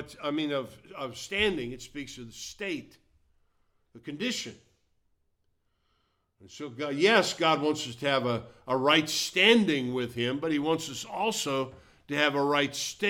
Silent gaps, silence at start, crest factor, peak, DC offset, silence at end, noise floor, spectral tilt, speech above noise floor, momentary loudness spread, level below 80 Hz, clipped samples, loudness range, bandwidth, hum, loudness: none; 0 s; 24 dB; -6 dBFS; under 0.1%; 0 s; -74 dBFS; -3.5 dB/octave; 45 dB; 18 LU; -62 dBFS; under 0.1%; 15 LU; 17.5 kHz; none; -27 LUFS